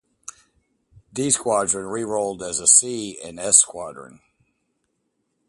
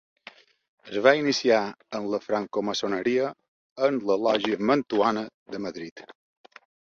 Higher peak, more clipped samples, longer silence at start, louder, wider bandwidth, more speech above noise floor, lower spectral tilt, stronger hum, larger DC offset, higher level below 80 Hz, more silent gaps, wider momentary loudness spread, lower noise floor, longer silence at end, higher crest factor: first, 0 dBFS vs -4 dBFS; neither; first, 1.15 s vs 0.85 s; first, -18 LUFS vs -25 LUFS; first, 12 kHz vs 7.6 kHz; first, 52 dB vs 26 dB; second, -2 dB/octave vs -4.5 dB/octave; neither; neither; first, -60 dBFS vs -70 dBFS; second, none vs 3.48-3.76 s, 5.34-5.46 s, 5.91-5.96 s; first, 22 LU vs 13 LU; first, -73 dBFS vs -51 dBFS; first, 1.4 s vs 0.7 s; about the same, 24 dB vs 24 dB